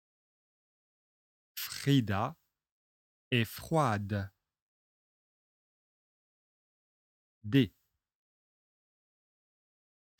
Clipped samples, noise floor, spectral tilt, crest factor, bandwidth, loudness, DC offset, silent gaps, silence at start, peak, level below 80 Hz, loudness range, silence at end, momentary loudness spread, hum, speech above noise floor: under 0.1%; under -90 dBFS; -6 dB/octave; 24 dB; 18 kHz; -32 LUFS; under 0.1%; 2.72-3.31 s, 4.62-7.41 s; 1.55 s; -14 dBFS; -70 dBFS; 5 LU; 2.5 s; 12 LU; none; over 60 dB